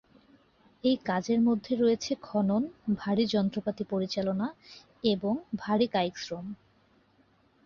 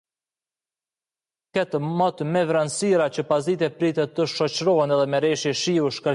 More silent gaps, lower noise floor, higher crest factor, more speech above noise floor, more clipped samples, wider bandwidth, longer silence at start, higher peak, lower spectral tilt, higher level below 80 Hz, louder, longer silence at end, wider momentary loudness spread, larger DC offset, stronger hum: neither; second, -65 dBFS vs under -90 dBFS; about the same, 18 dB vs 14 dB; second, 37 dB vs over 68 dB; neither; second, 7.2 kHz vs 11.5 kHz; second, 0.85 s vs 1.55 s; second, -12 dBFS vs -8 dBFS; about the same, -6 dB/octave vs -5 dB/octave; about the same, -66 dBFS vs -70 dBFS; second, -29 LUFS vs -22 LUFS; first, 1.1 s vs 0 s; first, 10 LU vs 4 LU; neither; neither